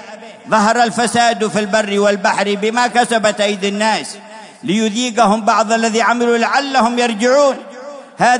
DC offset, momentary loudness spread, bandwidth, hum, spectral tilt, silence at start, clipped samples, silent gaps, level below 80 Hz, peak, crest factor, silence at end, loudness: under 0.1%; 14 LU; 11 kHz; none; -3.5 dB/octave; 0 s; under 0.1%; none; -62 dBFS; 0 dBFS; 14 dB; 0 s; -14 LUFS